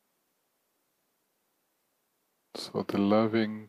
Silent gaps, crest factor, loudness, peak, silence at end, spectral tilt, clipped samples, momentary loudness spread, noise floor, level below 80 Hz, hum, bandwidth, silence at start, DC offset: none; 20 dB; -28 LUFS; -14 dBFS; 0 s; -7 dB/octave; under 0.1%; 16 LU; -77 dBFS; -80 dBFS; none; 13.5 kHz; 2.55 s; under 0.1%